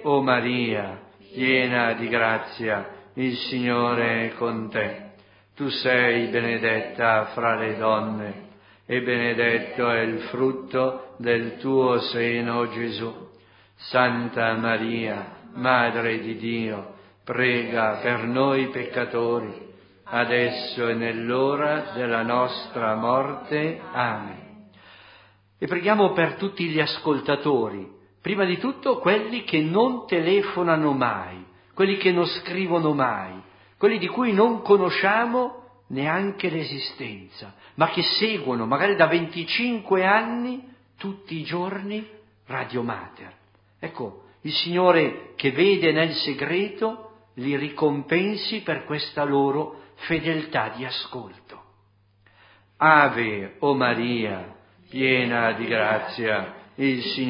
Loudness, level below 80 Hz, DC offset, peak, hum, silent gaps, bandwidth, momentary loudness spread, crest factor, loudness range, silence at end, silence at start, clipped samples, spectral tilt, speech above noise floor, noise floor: -23 LUFS; -64 dBFS; under 0.1%; -2 dBFS; none; none; 5.4 kHz; 15 LU; 22 dB; 4 LU; 0 s; 0 s; under 0.1%; -10 dB/octave; 37 dB; -61 dBFS